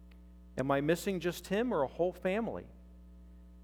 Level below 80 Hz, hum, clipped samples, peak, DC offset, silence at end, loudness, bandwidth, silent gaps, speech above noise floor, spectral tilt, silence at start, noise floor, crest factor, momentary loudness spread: -56 dBFS; none; under 0.1%; -16 dBFS; under 0.1%; 0 s; -34 LUFS; 18 kHz; none; 21 dB; -6 dB/octave; 0 s; -54 dBFS; 18 dB; 12 LU